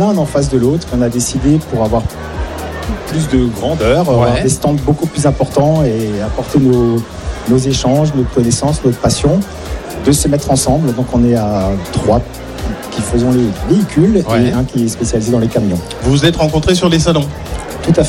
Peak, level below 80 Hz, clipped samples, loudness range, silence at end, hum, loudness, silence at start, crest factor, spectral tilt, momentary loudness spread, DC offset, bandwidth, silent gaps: 0 dBFS; -26 dBFS; under 0.1%; 2 LU; 0 s; none; -13 LUFS; 0 s; 12 dB; -6 dB/octave; 10 LU; under 0.1%; 16.5 kHz; none